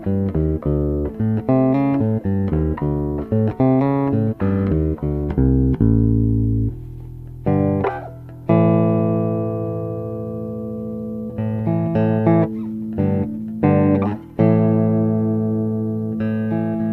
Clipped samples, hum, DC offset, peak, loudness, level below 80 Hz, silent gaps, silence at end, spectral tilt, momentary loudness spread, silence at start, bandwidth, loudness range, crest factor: under 0.1%; none; under 0.1%; -2 dBFS; -19 LUFS; -32 dBFS; none; 0 s; -12 dB/octave; 11 LU; 0 s; 4.2 kHz; 3 LU; 18 dB